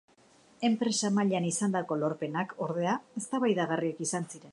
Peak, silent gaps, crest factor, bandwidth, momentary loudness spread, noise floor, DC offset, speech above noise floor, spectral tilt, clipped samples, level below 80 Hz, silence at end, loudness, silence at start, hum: -14 dBFS; none; 16 dB; 11.5 kHz; 6 LU; -61 dBFS; under 0.1%; 31 dB; -4.5 dB/octave; under 0.1%; -80 dBFS; 0 s; -30 LUFS; 0.6 s; none